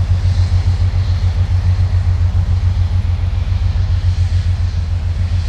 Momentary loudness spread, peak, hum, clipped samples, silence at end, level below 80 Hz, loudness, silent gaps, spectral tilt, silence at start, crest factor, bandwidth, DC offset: 3 LU; -4 dBFS; none; under 0.1%; 0 s; -20 dBFS; -16 LUFS; none; -7 dB/octave; 0 s; 10 dB; 7.2 kHz; under 0.1%